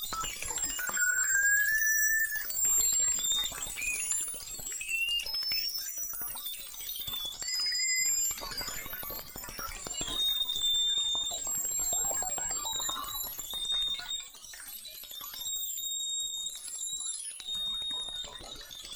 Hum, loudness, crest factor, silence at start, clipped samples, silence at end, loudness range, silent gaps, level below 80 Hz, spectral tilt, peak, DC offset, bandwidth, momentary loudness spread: none; -30 LUFS; 16 dB; 0 s; under 0.1%; 0 s; 8 LU; none; -56 dBFS; 2 dB/octave; -16 dBFS; under 0.1%; over 20 kHz; 13 LU